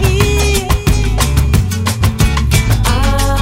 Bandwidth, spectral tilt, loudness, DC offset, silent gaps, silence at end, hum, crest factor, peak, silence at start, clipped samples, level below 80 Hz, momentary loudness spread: 16.5 kHz; -5 dB/octave; -13 LUFS; under 0.1%; none; 0 s; none; 12 dB; 0 dBFS; 0 s; under 0.1%; -16 dBFS; 2 LU